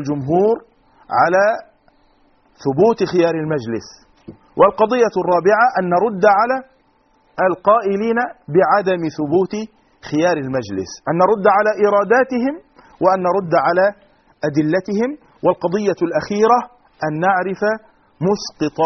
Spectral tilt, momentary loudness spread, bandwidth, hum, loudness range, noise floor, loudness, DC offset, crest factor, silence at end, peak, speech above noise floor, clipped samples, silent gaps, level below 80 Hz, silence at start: -5 dB/octave; 10 LU; 6.4 kHz; none; 3 LU; -57 dBFS; -17 LUFS; under 0.1%; 18 dB; 0 s; 0 dBFS; 41 dB; under 0.1%; none; -56 dBFS; 0 s